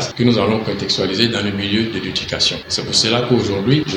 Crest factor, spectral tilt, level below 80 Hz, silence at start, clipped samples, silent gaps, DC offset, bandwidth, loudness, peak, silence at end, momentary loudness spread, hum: 18 dB; -4.5 dB/octave; -46 dBFS; 0 s; under 0.1%; none; under 0.1%; 16 kHz; -17 LUFS; 0 dBFS; 0 s; 5 LU; none